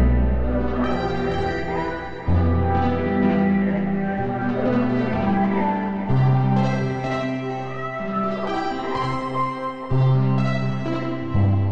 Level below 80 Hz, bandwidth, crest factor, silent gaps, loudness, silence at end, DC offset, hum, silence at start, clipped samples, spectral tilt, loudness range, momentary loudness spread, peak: -32 dBFS; 7.4 kHz; 14 dB; none; -22 LUFS; 0 s; under 0.1%; none; 0 s; under 0.1%; -8.5 dB/octave; 3 LU; 7 LU; -6 dBFS